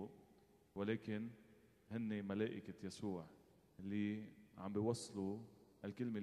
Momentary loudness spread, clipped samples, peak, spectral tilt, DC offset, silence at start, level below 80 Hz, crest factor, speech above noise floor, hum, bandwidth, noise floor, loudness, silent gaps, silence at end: 13 LU; under 0.1%; -26 dBFS; -6.5 dB/octave; under 0.1%; 0 s; -80 dBFS; 20 dB; 26 dB; none; 12.5 kHz; -71 dBFS; -46 LUFS; none; 0 s